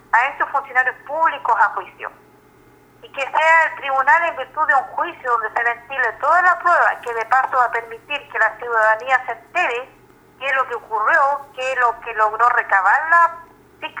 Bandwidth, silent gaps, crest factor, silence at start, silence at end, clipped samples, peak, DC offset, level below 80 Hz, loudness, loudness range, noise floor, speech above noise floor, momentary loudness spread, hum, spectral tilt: over 20 kHz; none; 18 dB; 0.15 s; 0 s; under 0.1%; -2 dBFS; under 0.1%; -62 dBFS; -17 LUFS; 3 LU; -50 dBFS; 32 dB; 12 LU; none; -2 dB/octave